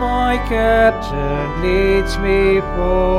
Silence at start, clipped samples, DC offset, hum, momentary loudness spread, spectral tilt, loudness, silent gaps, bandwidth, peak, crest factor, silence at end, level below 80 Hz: 0 s; under 0.1%; under 0.1%; none; 7 LU; -6.5 dB/octave; -16 LUFS; none; 13.5 kHz; -2 dBFS; 14 dB; 0 s; -24 dBFS